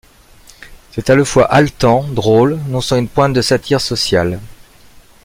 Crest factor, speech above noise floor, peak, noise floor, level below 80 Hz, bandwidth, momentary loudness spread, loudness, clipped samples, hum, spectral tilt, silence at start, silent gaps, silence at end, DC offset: 14 dB; 30 dB; 0 dBFS; -43 dBFS; -38 dBFS; 16.5 kHz; 9 LU; -13 LUFS; under 0.1%; none; -5.5 dB/octave; 0.6 s; none; 0.75 s; under 0.1%